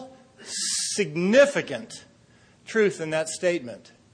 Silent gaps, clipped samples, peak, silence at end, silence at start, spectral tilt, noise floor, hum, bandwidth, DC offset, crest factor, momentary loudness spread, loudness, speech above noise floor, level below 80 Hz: none; under 0.1%; -6 dBFS; 0.35 s; 0 s; -3.5 dB/octave; -57 dBFS; none; 10.5 kHz; under 0.1%; 20 dB; 23 LU; -24 LUFS; 33 dB; -70 dBFS